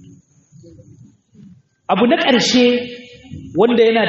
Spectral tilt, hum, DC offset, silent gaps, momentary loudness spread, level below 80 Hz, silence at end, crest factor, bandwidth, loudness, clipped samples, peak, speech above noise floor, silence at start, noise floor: -2.5 dB/octave; none; under 0.1%; none; 23 LU; -56 dBFS; 0 s; 16 dB; 7.6 kHz; -14 LUFS; under 0.1%; -2 dBFS; 33 dB; 1.9 s; -47 dBFS